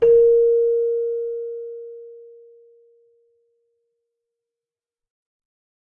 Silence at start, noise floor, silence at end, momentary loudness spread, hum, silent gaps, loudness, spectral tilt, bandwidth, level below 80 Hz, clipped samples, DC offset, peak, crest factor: 0 s; under -90 dBFS; 3.75 s; 24 LU; none; none; -19 LUFS; -8 dB/octave; 2.9 kHz; -58 dBFS; under 0.1%; under 0.1%; -8 dBFS; 16 dB